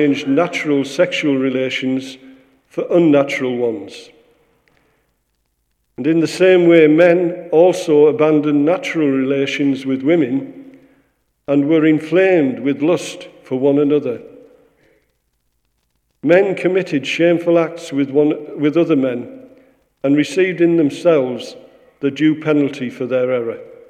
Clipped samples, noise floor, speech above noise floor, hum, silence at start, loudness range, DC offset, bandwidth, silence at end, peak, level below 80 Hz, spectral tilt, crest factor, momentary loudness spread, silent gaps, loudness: under 0.1%; -67 dBFS; 52 dB; none; 0 s; 7 LU; under 0.1%; 11 kHz; 0.15 s; 0 dBFS; -68 dBFS; -6.5 dB/octave; 16 dB; 12 LU; none; -15 LUFS